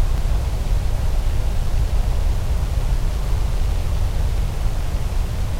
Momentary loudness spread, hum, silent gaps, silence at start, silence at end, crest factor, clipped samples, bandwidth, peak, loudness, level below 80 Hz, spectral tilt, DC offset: 2 LU; none; none; 0 s; 0 s; 12 dB; under 0.1%; 15.5 kHz; -8 dBFS; -24 LUFS; -20 dBFS; -6 dB/octave; under 0.1%